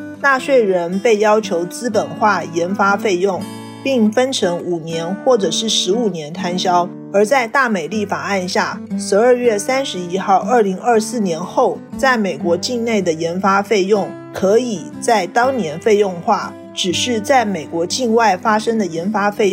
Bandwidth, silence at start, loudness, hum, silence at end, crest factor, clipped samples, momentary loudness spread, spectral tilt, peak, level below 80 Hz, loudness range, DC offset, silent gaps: 16 kHz; 0 s; -16 LUFS; none; 0 s; 14 dB; under 0.1%; 7 LU; -4 dB/octave; -4 dBFS; -60 dBFS; 1 LU; under 0.1%; none